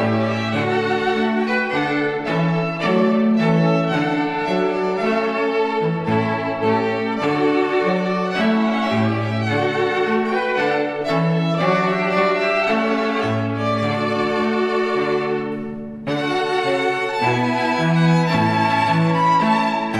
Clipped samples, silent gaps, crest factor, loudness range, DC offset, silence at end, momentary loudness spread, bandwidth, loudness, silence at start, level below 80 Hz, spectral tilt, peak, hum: under 0.1%; none; 14 dB; 2 LU; under 0.1%; 0 s; 4 LU; 10.5 kHz; -19 LUFS; 0 s; -58 dBFS; -7 dB/octave; -6 dBFS; none